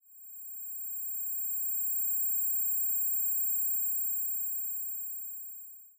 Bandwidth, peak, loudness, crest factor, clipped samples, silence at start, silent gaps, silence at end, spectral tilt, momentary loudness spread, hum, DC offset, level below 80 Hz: 16 kHz; -22 dBFS; -29 LUFS; 10 dB; under 0.1%; 0.1 s; none; 0.1 s; 6.5 dB/octave; 13 LU; none; under 0.1%; under -90 dBFS